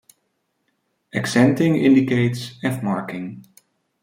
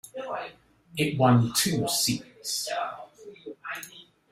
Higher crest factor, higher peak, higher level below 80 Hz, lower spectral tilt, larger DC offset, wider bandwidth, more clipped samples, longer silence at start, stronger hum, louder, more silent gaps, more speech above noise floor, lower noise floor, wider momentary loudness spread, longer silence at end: about the same, 18 dB vs 20 dB; first, -2 dBFS vs -8 dBFS; about the same, -62 dBFS vs -62 dBFS; first, -6.5 dB/octave vs -4 dB/octave; neither; about the same, 16 kHz vs 16 kHz; neither; first, 1.15 s vs 0.05 s; neither; first, -19 LUFS vs -26 LUFS; neither; first, 53 dB vs 23 dB; first, -72 dBFS vs -48 dBFS; second, 14 LU vs 22 LU; first, 0.6 s vs 0.3 s